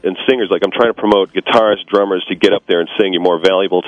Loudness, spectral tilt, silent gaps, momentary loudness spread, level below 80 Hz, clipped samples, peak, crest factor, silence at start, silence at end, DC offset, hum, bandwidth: -14 LUFS; -5.5 dB/octave; none; 3 LU; -52 dBFS; 0.3%; 0 dBFS; 14 dB; 0 s; 0 s; under 0.1%; none; 11 kHz